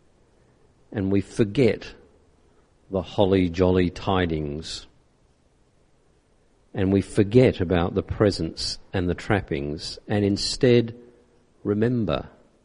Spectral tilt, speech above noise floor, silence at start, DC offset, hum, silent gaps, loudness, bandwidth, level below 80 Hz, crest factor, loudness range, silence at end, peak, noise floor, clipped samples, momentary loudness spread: -6.5 dB/octave; 39 dB; 0.9 s; under 0.1%; none; none; -24 LUFS; 11 kHz; -42 dBFS; 20 dB; 5 LU; 0.35 s; -4 dBFS; -61 dBFS; under 0.1%; 13 LU